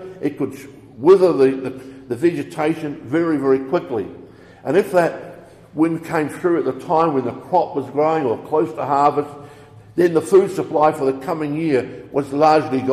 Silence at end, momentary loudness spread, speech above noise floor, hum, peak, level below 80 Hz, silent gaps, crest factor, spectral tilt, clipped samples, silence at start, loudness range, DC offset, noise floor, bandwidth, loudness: 0 s; 12 LU; 24 dB; none; -2 dBFS; -58 dBFS; none; 18 dB; -7 dB/octave; under 0.1%; 0 s; 3 LU; under 0.1%; -42 dBFS; 14 kHz; -19 LUFS